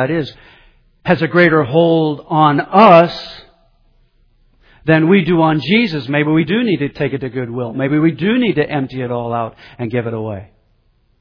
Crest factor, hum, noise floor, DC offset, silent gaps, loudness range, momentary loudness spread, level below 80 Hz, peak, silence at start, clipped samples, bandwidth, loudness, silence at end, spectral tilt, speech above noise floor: 14 dB; none; -57 dBFS; under 0.1%; none; 6 LU; 14 LU; -48 dBFS; 0 dBFS; 0 s; 0.1%; 5.4 kHz; -14 LUFS; 0.75 s; -8.5 dB/octave; 43 dB